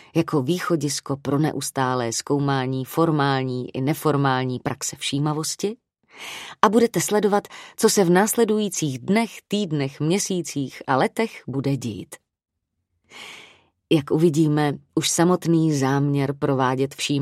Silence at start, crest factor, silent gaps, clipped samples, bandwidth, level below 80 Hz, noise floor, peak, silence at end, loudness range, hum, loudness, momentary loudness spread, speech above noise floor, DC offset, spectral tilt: 0.15 s; 22 dB; none; under 0.1%; 16 kHz; -62 dBFS; -76 dBFS; 0 dBFS; 0 s; 5 LU; none; -22 LUFS; 10 LU; 54 dB; under 0.1%; -5 dB/octave